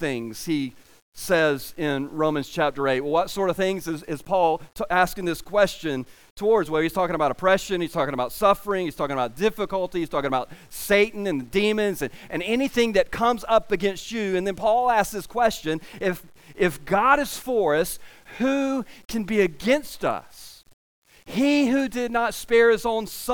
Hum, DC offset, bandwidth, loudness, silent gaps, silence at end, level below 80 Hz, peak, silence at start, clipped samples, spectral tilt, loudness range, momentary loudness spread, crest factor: none; under 0.1%; 19.5 kHz; -23 LUFS; 1.02-1.12 s, 6.30-6.36 s, 20.73-21.02 s; 0 s; -50 dBFS; -6 dBFS; 0 s; under 0.1%; -4.5 dB/octave; 2 LU; 10 LU; 18 dB